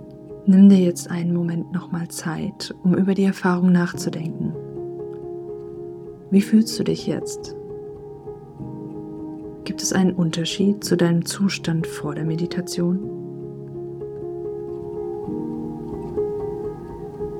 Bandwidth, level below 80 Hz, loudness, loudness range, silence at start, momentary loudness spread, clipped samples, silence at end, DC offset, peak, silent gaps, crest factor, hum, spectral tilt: 14 kHz; -52 dBFS; -22 LUFS; 8 LU; 0 s; 16 LU; under 0.1%; 0 s; under 0.1%; -2 dBFS; none; 20 dB; none; -6 dB/octave